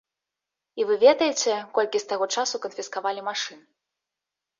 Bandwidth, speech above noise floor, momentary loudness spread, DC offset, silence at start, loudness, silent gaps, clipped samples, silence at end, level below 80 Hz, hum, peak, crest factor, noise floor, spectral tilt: 7.6 kHz; 63 dB; 13 LU; under 0.1%; 0.75 s; -24 LUFS; none; under 0.1%; 1.05 s; -76 dBFS; none; -6 dBFS; 20 dB; -87 dBFS; -1 dB/octave